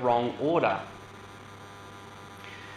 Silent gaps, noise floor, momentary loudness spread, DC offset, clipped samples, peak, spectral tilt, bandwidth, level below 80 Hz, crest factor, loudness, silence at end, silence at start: none; -46 dBFS; 20 LU; under 0.1%; under 0.1%; -12 dBFS; -6 dB/octave; 13 kHz; -64 dBFS; 20 dB; -27 LUFS; 0 s; 0 s